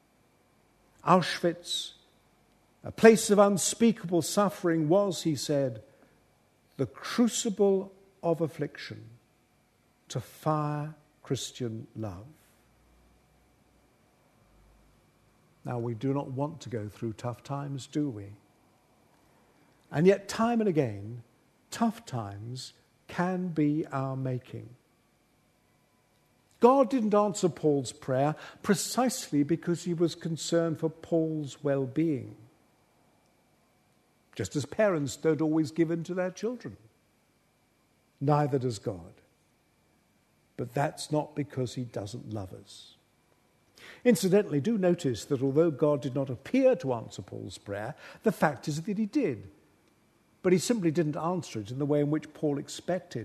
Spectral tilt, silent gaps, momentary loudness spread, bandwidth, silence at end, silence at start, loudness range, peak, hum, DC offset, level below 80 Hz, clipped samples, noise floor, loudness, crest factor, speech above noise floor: -5.5 dB/octave; none; 16 LU; 13.5 kHz; 0 s; 1.05 s; 10 LU; -4 dBFS; none; under 0.1%; -70 dBFS; under 0.1%; -68 dBFS; -29 LUFS; 26 dB; 40 dB